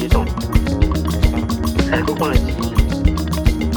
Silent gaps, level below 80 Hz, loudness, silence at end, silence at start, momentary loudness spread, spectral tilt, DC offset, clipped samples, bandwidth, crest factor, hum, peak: none; -20 dBFS; -18 LUFS; 0 s; 0 s; 2 LU; -6.5 dB/octave; under 0.1%; under 0.1%; 20 kHz; 16 dB; none; 0 dBFS